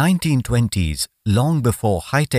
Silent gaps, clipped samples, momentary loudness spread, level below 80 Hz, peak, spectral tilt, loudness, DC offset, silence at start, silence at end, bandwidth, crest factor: none; under 0.1%; 4 LU; -36 dBFS; -4 dBFS; -5.5 dB/octave; -19 LUFS; under 0.1%; 0 s; 0 s; 16 kHz; 14 dB